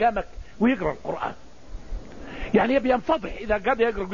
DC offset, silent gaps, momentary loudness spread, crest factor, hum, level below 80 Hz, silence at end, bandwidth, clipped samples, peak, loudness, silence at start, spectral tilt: 0.8%; none; 19 LU; 18 dB; none; -40 dBFS; 0 s; 7.4 kHz; under 0.1%; -6 dBFS; -24 LUFS; 0 s; -7 dB/octave